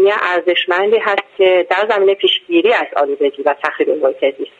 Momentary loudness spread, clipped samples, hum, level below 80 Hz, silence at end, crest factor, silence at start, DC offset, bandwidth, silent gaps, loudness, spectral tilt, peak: 5 LU; under 0.1%; none; -64 dBFS; 0.1 s; 14 dB; 0 s; under 0.1%; 7.6 kHz; none; -14 LUFS; -4 dB/octave; 0 dBFS